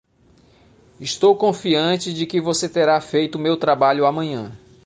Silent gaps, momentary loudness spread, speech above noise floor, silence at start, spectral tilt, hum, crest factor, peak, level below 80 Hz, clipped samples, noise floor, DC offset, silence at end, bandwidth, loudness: none; 11 LU; 36 dB; 1 s; -4.5 dB/octave; none; 16 dB; -4 dBFS; -60 dBFS; under 0.1%; -54 dBFS; under 0.1%; 0.3 s; 10 kHz; -19 LUFS